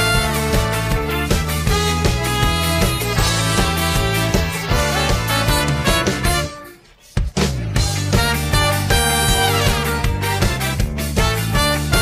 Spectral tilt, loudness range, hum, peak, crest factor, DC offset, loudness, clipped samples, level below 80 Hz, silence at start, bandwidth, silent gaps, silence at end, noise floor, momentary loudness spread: -4 dB/octave; 2 LU; none; -4 dBFS; 14 dB; under 0.1%; -18 LUFS; under 0.1%; -24 dBFS; 0 s; 16 kHz; none; 0 s; -43 dBFS; 4 LU